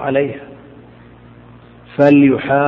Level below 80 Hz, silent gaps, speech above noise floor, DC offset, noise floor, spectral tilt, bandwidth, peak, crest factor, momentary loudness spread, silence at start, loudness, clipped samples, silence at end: -52 dBFS; none; 29 dB; under 0.1%; -41 dBFS; -9.5 dB/octave; 5.2 kHz; 0 dBFS; 16 dB; 19 LU; 0 s; -13 LUFS; under 0.1%; 0 s